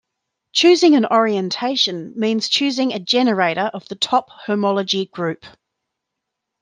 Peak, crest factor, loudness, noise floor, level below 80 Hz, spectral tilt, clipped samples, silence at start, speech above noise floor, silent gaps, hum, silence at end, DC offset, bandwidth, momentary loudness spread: -2 dBFS; 16 dB; -18 LUFS; -80 dBFS; -70 dBFS; -4 dB/octave; under 0.1%; 0.55 s; 62 dB; none; none; 1.15 s; under 0.1%; 9.6 kHz; 11 LU